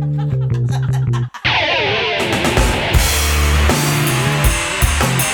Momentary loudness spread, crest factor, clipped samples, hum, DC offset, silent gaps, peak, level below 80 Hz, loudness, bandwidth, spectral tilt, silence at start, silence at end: 4 LU; 14 dB; under 0.1%; none; under 0.1%; none; 0 dBFS; -22 dBFS; -15 LUFS; over 20 kHz; -4 dB/octave; 0 s; 0 s